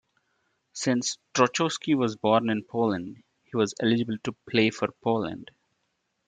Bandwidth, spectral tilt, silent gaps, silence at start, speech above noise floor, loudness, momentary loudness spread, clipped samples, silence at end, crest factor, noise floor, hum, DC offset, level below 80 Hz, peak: 9.4 kHz; -4.5 dB/octave; none; 0.75 s; 51 dB; -26 LUFS; 10 LU; under 0.1%; 0.85 s; 20 dB; -77 dBFS; none; under 0.1%; -68 dBFS; -6 dBFS